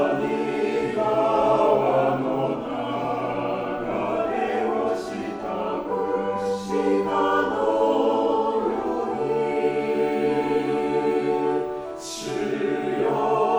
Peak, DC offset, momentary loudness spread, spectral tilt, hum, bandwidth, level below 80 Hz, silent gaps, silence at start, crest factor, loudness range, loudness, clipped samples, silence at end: -6 dBFS; under 0.1%; 7 LU; -6 dB/octave; none; over 20 kHz; -56 dBFS; none; 0 s; 16 dB; 3 LU; -24 LUFS; under 0.1%; 0 s